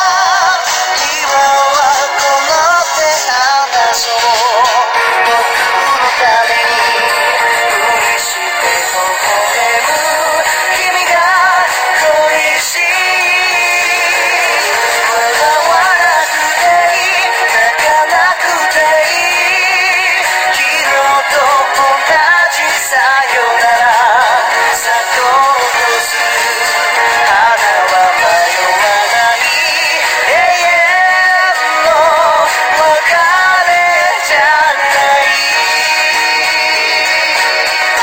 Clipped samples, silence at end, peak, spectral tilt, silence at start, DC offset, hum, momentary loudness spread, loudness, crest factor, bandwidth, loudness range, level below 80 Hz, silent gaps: under 0.1%; 0 s; 0 dBFS; 1 dB/octave; 0 s; under 0.1%; none; 3 LU; -9 LUFS; 10 dB; 17 kHz; 1 LU; -50 dBFS; none